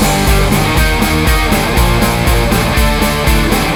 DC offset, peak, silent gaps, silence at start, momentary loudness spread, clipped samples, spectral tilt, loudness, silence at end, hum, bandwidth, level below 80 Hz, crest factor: 0.3%; 0 dBFS; none; 0 s; 1 LU; under 0.1%; -4.5 dB/octave; -12 LUFS; 0 s; none; 16 kHz; -16 dBFS; 10 dB